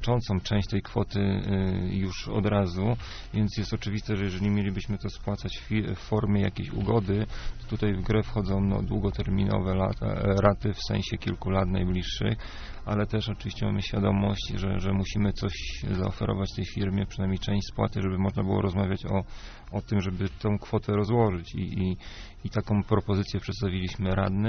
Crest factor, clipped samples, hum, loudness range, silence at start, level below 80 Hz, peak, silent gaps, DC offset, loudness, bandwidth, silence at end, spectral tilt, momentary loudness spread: 20 dB; under 0.1%; none; 2 LU; 0 s; -38 dBFS; -6 dBFS; none; under 0.1%; -29 LUFS; 6.6 kHz; 0 s; -6.5 dB/octave; 7 LU